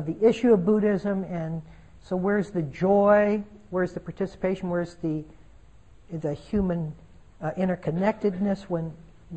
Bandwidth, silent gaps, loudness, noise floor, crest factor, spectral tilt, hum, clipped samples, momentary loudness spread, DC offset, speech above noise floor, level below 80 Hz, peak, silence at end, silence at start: 8.6 kHz; none; -26 LUFS; -53 dBFS; 18 dB; -8.5 dB/octave; none; under 0.1%; 13 LU; 0.2%; 28 dB; -50 dBFS; -8 dBFS; 0 s; 0 s